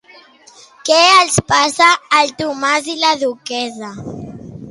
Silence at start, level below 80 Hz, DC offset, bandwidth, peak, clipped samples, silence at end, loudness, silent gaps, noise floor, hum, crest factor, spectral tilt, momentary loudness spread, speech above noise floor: 0.85 s; -50 dBFS; under 0.1%; 11.5 kHz; 0 dBFS; under 0.1%; 0 s; -13 LUFS; none; -44 dBFS; none; 16 dB; -2.5 dB/octave; 20 LU; 30 dB